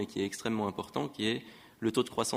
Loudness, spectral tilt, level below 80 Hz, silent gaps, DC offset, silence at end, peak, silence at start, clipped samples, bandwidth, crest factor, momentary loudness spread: -34 LUFS; -4.5 dB/octave; -68 dBFS; none; under 0.1%; 0 s; -14 dBFS; 0 s; under 0.1%; 16 kHz; 20 dB; 6 LU